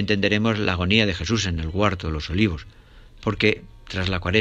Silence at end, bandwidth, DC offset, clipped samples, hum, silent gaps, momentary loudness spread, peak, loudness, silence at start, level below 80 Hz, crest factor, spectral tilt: 0 s; 8.8 kHz; under 0.1%; under 0.1%; none; none; 10 LU; -4 dBFS; -22 LUFS; 0 s; -40 dBFS; 20 dB; -5.5 dB/octave